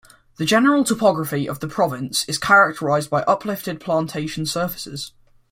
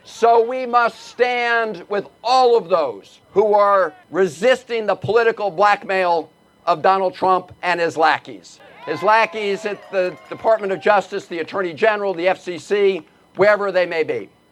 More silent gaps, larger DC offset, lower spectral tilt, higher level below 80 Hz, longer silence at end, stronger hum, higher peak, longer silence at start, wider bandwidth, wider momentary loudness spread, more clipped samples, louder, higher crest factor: neither; neither; about the same, -4.5 dB/octave vs -4.5 dB/octave; first, -56 dBFS vs -66 dBFS; first, 0.45 s vs 0.25 s; neither; about the same, -2 dBFS vs -2 dBFS; first, 0.4 s vs 0.1 s; first, 16.5 kHz vs 12 kHz; about the same, 12 LU vs 10 LU; neither; about the same, -20 LUFS vs -18 LUFS; about the same, 18 dB vs 18 dB